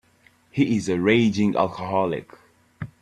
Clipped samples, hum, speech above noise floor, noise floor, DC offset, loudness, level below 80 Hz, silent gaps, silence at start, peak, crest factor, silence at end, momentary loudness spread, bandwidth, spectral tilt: under 0.1%; none; 37 dB; -59 dBFS; under 0.1%; -22 LUFS; -58 dBFS; none; 0.55 s; -4 dBFS; 20 dB; 0.15 s; 14 LU; 9.8 kHz; -6.5 dB/octave